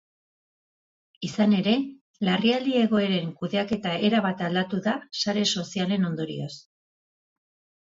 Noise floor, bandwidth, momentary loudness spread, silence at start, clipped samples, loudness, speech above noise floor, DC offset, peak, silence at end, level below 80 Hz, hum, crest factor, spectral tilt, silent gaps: under -90 dBFS; 7.8 kHz; 10 LU; 1.2 s; under 0.1%; -25 LUFS; over 65 dB; under 0.1%; -10 dBFS; 1.25 s; -68 dBFS; none; 16 dB; -5.5 dB/octave; 2.01-2.14 s